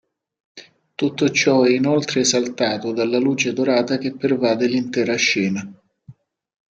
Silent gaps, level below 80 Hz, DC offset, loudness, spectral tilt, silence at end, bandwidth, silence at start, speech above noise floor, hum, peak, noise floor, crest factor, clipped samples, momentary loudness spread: none; -66 dBFS; under 0.1%; -19 LUFS; -4 dB/octave; 0.65 s; 9 kHz; 0.55 s; 29 dB; none; -4 dBFS; -47 dBFS; 16 dB; under 0.1%; 8 LU